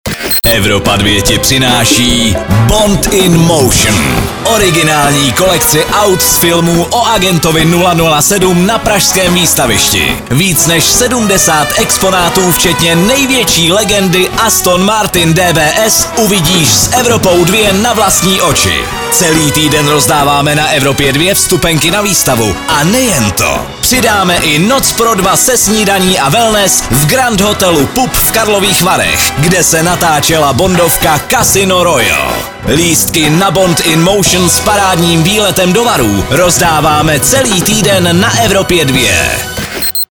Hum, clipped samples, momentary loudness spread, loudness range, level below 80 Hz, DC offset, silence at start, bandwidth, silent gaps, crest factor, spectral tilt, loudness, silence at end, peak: none; 0.3%; 3 LU; 1 LU; -26 dBFS; under 0.1%; 0.05 s; over 20 kHz; none; 8 dB; -3 dB/octave; -7 LUFS; 0.05 s; 0 dBFS